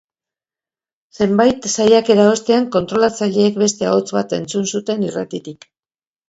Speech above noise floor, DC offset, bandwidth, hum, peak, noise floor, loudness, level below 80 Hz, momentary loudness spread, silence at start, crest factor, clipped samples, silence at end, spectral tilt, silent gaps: over 74 dB; under 0.1%; 8 kHz; none; 0 dBFS; under -90 dBFS; -16 LUFS; -56 dBFS; 9 LU; 1.2 s; 16 dB; under 0.1%; 0.75 s; -4.5 dB/octave; none